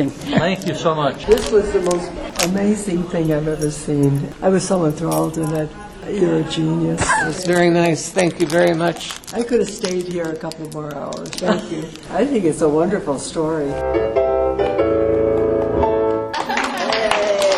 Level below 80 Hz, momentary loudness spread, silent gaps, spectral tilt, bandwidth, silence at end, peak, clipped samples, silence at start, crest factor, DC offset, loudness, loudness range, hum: -40 dBFS; 9 LU; none; -5 dB/octave; 13.5 kHz; 0 s; 0 dBFS; under 0.1%; 0 s; 18 dB; under 0.1%; -19 LUFS; 3 LU; none